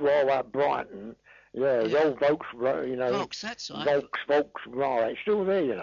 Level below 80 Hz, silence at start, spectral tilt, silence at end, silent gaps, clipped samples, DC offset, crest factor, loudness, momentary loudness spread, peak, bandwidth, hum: -66 dBFS; 0 s; -5.5 dB/octave; 0 s; none; under 0.1%; under 0.1%; 12 dB; -27 LUFS; 11 LU; -14 dBFS; 7.4 kHz; none